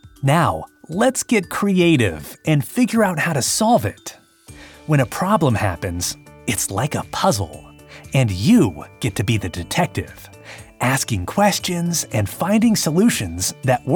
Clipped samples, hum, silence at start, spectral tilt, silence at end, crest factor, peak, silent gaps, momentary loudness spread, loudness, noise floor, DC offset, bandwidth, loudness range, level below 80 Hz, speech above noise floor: under 0.1%; none; 0.05 s; -5 dB/octave; 0 s; 16 dB; -4 dBFS; none; 12 LU; -19 LUFS; -43 dBFS; under 0.1%; 19 kHz; 3 LU; -46 dBFS; 24 dB